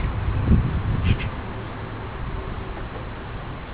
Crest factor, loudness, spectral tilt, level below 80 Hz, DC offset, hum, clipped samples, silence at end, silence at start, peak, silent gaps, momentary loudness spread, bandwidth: 20 dB; -27 LUFS; -11 dB/octave; -28 dBFS; 0.4%; none; under 0.1%; 0 s; 0 s; -6 dBFS; none; 13 LU; 4 kHz